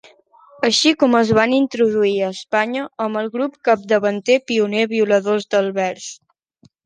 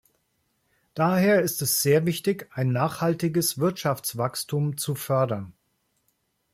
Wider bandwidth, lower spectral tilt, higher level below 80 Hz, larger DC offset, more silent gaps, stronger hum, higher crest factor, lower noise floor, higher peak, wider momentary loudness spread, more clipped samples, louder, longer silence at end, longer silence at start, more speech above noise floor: second, 10 kHz vs 16.5 kHz; about the same, -4 dB/octave vs -5 dB/octave; about the same, -60 dBFS vs -64 dBFS; neither; neither; neither; about the same, 16 dB vs 16 dB; second, -56 dBFS vs -72 dBFS; first, -2 dBFS vs -8 dBFS; about the same, 8 LU vs 8 LU; neither; first, -18 LUFS vs -24 LUFS; second, 0.7 s vs 1.05 s; second, 0.6 s vs 0.95 s; second, 38 dB vs 48 dB